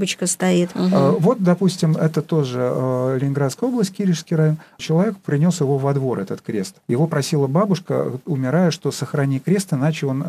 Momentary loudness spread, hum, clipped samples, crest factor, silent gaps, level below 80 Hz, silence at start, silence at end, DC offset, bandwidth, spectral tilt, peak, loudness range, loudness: 7 LU; none; under 0.1%; 14 dB; none; -66 dBFS; 0 s; 0 s; under 0.1%; 14.5 kHz; -6.5 dB/octave; -4 dBFS; 2 LU; -20 LUFS